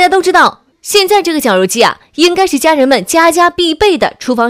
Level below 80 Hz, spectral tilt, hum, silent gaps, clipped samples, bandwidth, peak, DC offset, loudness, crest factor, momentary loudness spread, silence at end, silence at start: -42 dBFS; -2.5 dB/octave; none; none; 0.8%; 16.5 kHz; 0 dBFS; 0.1%; -9 LUFS; 10 dB; 4 LU; 0 s; 0 s